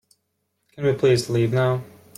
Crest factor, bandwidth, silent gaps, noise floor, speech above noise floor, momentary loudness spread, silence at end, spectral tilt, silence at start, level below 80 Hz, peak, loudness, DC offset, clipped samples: 14 dB; 15 kHz; none; -74 dBFS; 54 dB; 6 LU; 0.3 s; -6.5 dB/octave; 0.8 s; -58 dBFS; -8 dBFS; -21 LUFS; under 0.1%; under 0.1%